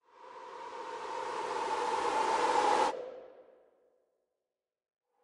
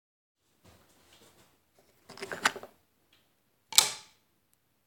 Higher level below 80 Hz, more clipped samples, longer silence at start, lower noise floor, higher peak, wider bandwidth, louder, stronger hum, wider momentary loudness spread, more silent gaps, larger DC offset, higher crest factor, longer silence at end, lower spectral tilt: about the same, -74 dBFS vs -76 dBFS; neither; second, 0.2 s vs 2.1 s; first, under -90 dBFS vs -73 dBFS; second, -14 dBFS vs 0 dBFS; second, 11.5 kHz vs 17 kHz; second, -33 LUFS vs -27 LUFS; neither; second, 19 LU vs 23 LU; neither; neither; second, 20 dB vs 36 dB; first, 1.8 s vs 0.85 s; first, -2 dB/octave vs 1 dB/octave